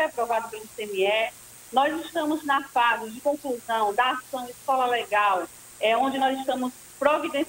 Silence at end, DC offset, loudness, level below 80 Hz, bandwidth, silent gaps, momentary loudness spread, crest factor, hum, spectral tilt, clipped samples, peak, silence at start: 0 s; under 0.1%; -25 LUFS; -66 dBFS; 16 kHz; none; 9 LU; 20 dB; none; -2.5 dB/octave; under 0.1%; -6 dBFS; 0 s